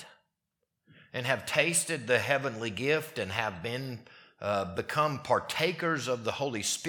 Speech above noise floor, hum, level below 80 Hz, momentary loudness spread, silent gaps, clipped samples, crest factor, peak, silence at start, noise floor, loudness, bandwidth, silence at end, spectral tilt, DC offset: 53 dB; none; -70 dBFS; 9 LU; none; under 0.1%; 24 dB; -8 dBFS; 0 s; -83 dBFS; -30 LUFS; 19 kHz; 0 s; -3 dB/octave; under 0.1%